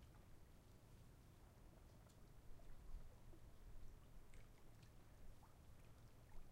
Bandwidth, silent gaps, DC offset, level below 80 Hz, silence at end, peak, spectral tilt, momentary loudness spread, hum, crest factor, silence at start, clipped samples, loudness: 16 kHz; none; under 0.1%; -64 dBFS; 0 s; -44 dBFS; -5.5 dB/octave; 4 LU; none; 16 dB; 0 s; under 0.1%; -67 LUFS